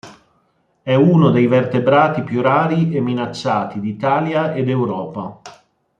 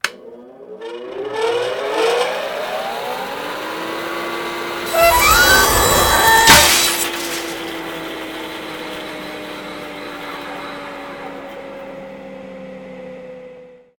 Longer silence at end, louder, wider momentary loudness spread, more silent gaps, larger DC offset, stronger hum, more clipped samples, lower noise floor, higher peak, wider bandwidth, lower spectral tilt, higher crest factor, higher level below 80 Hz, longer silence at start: first, 0.5 s vs 0.2 s; about the same, -16 LUFS vs -15 LUFS; second, 12 LU vs 24 LU; neither; neither; neither; neither; first, -62 dBFS vs -41 dBFS; about the same, -2 dBFS vs 0 dBFS; second, 7.6 kHz vs 19.5 kHz; first, -8 dB/octave vs -1.5 dB/octave; about the same, 14 dB vs 18 dB; second, -58 dBFS vs -36 dBFS; about the same, 0.05 s vs 0.05 s